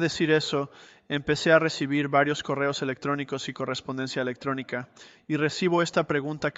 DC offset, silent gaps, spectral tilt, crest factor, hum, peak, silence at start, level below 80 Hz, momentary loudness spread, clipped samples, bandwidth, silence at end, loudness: under 0.1%; none; -5 dB/octave; 20 dB; none; -6 dBFS; 0 s; -62 dBFS; 10 LU; under 0.1%; 8.2 kHz; 0.05 s; -26 LUFS